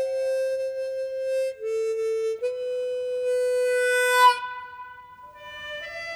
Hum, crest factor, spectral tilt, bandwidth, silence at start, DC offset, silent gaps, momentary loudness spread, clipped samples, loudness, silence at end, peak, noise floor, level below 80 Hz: none; 16 dB; 0.5 dB/octave; 16.5 kHz; 0 s; under 0.1%; none; 19 LU; under 0.1%; -25 LUFS; 0 s; -8 dBFS; -45 dBFS; -68 dBFS